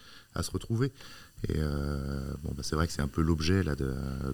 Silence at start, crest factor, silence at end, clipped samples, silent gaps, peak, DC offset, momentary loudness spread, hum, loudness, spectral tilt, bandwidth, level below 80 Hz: 0 s; 20 dB; 0 s; under 0.1%; none; -12 dBFS; 0.2%; 9 LU; none; -32 LUFS; -6 dB/octave; over 20 kHz; -40 dBFS